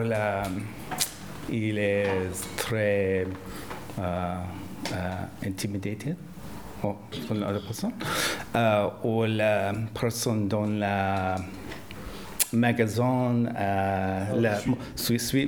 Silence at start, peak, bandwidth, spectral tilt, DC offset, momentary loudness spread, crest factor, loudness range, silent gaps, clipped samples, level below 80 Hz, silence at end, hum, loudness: 0 s; -2 dBFS; over 20 kHz; -5 dB/octave; 0.2%; 13 LU; 26 dB; 7 LU; none; under 0.1%; -52 dBFS; 0 s; none; -28 LUFS